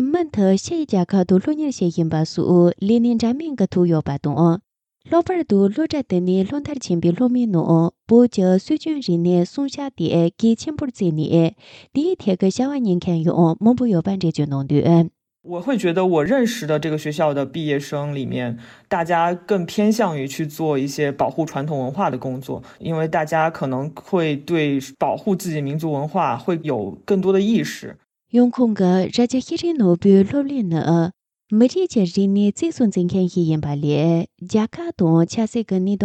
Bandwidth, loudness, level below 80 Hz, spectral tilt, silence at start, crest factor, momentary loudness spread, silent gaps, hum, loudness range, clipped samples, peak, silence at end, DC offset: 14 kHz; -19 LUFS; -58 dBFS; -7 dB/octave; 0 s; 16 dB; 8 LU; none; none; 4 LU; under 0.1%; -2 dBFS; 0 s; under 0.1%